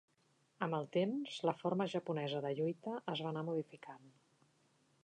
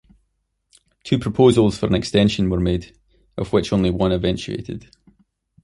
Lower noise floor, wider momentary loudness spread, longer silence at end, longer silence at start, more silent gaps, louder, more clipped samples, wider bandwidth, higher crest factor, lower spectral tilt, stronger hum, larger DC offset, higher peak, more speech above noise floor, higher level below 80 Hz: first, -76 dBFS vs -71 dBFS; second, 10 LU vs 16 LU; about the same, 0.95 s vs 0.85 s; second, 0.6 s vs 1.05 s; neither; second, -39 LUFS vs -19 LUFS; neither; second, 9.8 kHz vs 11.5 kHz; about the same, 20 dB vs 18 dB; about the same, -7 dB/octave vs -6.5 dB/octave; neither; neither; second, -20 dBFS vs -2 dBFS; second, 36 dB vs 53 dB; second, under -90 dBFS vs -38 dBFS